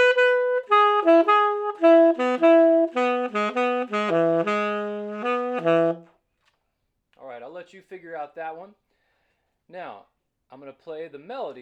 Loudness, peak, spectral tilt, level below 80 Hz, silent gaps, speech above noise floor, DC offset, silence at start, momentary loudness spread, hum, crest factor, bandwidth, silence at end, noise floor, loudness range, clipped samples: -20 LUFS; -6 dBFS; -6 dB/octave; -80 dBFS; none; 39 dB; under 0.1%; 0 s; 22 LU; none; 18 dB; 8.4 kHz; 0 s; -76 dBFS; 22 LU; under 0.1%